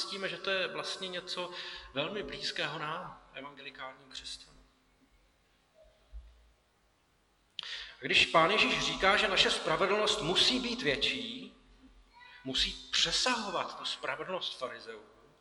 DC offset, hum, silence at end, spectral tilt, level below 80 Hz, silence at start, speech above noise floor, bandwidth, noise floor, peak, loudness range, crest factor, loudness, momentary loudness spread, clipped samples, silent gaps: under 0.1%; none; 0.4 s; -2 dB/octave; -58 dBFS; 0 s; 38 dB; 12 kHz; -71 dBFS; -10 dBFS; 21 LU; 24 dB; -30 LUFS; 20 LU; under 0.1%; none